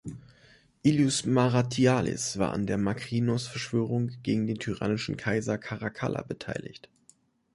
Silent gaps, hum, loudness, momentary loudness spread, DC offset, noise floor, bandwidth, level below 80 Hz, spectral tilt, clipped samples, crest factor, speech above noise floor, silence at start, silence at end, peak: none; none; -28 LUFS; 11 LU; under 0.1%; -63 dBFS; 11.5 kHz; -56 dBFS; -5.5 dB/octave; under 0.1%; 18 dB; 36 dB; 0.05 s; 0.75 s; -10 dBFS